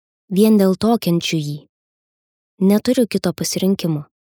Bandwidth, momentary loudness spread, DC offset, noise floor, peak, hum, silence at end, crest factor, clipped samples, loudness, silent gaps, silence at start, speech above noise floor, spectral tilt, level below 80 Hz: over 20 kHz; 9 LU; under 0.1%; under -90 dBFS; -2 dBFS; none; 0.25 s; 16 dB; under 0.1%; -17 LUFS; 1.69-2.58 s; 0.3 s; over 74 dB; -6 dB/octave; -56 dBFS